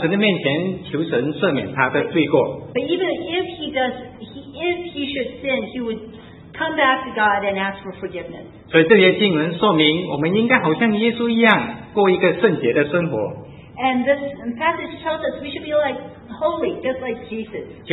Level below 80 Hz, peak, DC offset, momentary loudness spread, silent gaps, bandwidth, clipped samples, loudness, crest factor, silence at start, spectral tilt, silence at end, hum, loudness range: -54 dBFS; 0 dBFS; under 0.1%; 15 LU; none; 4.1 kHz; under 0.1%; -19 LUFS; 20 dB; 0 s; -9 dB/octave; 0 s; none; 7 LU